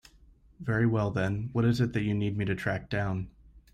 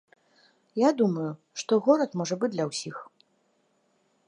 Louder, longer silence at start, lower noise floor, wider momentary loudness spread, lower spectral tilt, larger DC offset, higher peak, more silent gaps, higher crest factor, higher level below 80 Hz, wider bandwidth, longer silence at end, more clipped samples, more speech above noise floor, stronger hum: second, -30 LUFS vs -27 LUFS; second, 0.6 s vs 0.75 s; second, -58 dBFS vs -70 dBFS; second, 7 LU vs 14 LU; first, -8 dB/octave vs -5.5 dB/octave; neither; second, -16 dBFS vs -8 dBFS; neither; second, 14 dB vs 20 dB; first, -52 dBFS vs -82 dBFS; second, 9.8 kHz vs 11 kHz; second, 0.15 s vs 1.25 s; neither; second, 30 dB vs 44 dB; neither